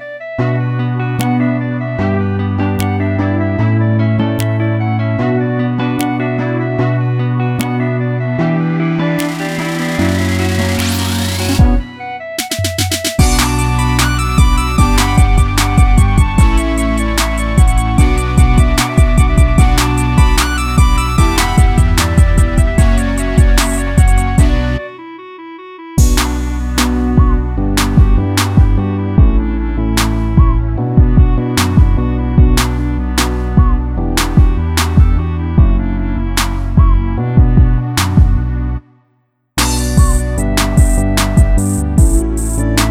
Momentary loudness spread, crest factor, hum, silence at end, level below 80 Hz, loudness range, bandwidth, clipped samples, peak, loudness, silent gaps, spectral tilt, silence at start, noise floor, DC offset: 6 LU; 12 dB; none; 0 s; -14 dBFS; 4 LU; 16.5 kHz; under 0.1%; 0 dBFS; -13 LUFS; none; -5.5 dB/octave; 0 s; -60 dBFS; under 0.1%